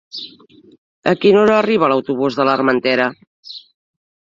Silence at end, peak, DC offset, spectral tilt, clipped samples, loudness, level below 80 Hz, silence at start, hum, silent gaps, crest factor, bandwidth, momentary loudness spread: 0.75 s; -2 dBFS; under 0.1%; -6.5 dB/octave; under 0.1%; -15 LUFS; -60 dBFS; 0.15 s; none; 0.78-1.02 s, 3.27-3.43 s; 16 dB; 7.6 kHz; 22 LU